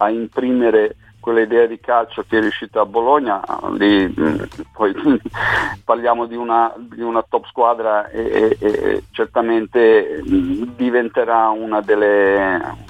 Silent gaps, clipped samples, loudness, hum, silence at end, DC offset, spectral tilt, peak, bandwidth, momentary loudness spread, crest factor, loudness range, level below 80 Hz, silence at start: none; under 0.1%; -17 LUFS; none; 0.05 s; under 0.1%; -6.5 dB/octave; 0 dBFS; 9.2 kHz; 7 LU; 16 dB; 2 LU; -46 dBFS; 0 s